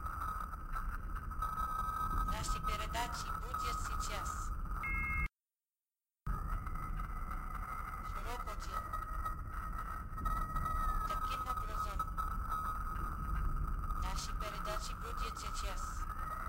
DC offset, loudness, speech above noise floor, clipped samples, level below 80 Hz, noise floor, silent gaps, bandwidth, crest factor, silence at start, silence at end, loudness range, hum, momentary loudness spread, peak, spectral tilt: under 0.1%; -41 LUFS; over 51 dB; under 0.1%; -42 dBFS; under -90 dBFS; none; 16 kHz; 16 dB; 0 s; 0 s; 4 LU; none; 6 LU; -22 dBFS; -4 dB/octave